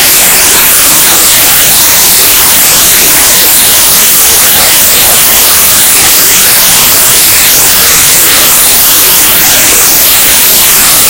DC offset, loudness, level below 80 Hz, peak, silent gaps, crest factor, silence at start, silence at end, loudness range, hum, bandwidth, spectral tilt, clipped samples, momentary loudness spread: under 0.1%; 0 LUFS; -30 dBFS; 0 dBFS; none; 4 dB; 0 s; 0 s; 0 LU; none; over 20 kHz; 0.5 dB/octave; 20%; 0 LU